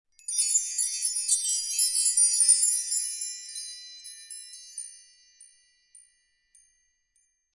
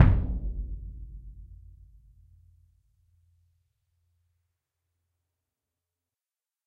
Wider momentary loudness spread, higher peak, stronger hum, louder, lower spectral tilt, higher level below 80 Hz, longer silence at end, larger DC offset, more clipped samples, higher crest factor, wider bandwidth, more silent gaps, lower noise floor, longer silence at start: about the same, 22 LU vs 24 LU; second, -8 dBFS vs -2 dBFS; neither; first, -23 LUFS vs -31 LUFS; second, 8.5 dB/octave vs -10 dB/octave; second, -80 dBFS vs -36 dBFS; second, 2.1 s vs 5.1 s; neither; neither; second, 22 dB vs 30 dB; first, 12 kHz vs 4.1 kHz; neither; second, -72 dBFS vs under -90 dBFS; first, 0.3 s vs 0 s